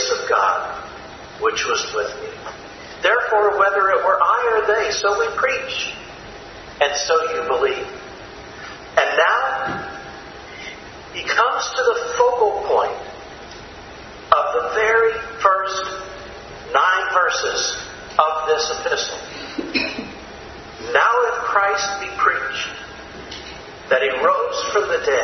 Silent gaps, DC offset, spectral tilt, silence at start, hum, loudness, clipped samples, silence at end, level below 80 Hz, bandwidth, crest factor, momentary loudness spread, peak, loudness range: none; under 0.1%; -1.5 dB/octave; 0 s; none; -19 LUFS; under 0.1%; 0 s; -50 dBFS; 6.4 kHz; 20 dB; 20 LU; 0 dBFS; 4 LU